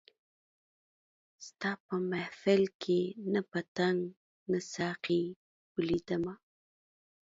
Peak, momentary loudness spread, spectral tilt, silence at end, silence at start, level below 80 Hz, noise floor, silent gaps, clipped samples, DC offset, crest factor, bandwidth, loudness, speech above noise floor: -16 dBFS; 12 LU; -6 dB/octave; 0.95 s; 1.4 s; -70 dBFS; under -90 dBFS; 1.80-1.89 s, 2.74-2.79 s, 3.68-3.75 s, 4.17-4.46 s, 5.36-5.75 s; under 0.1%; under 0.1%; 20 dB; 7.8 kHz; -34 LUFS; over 57 dB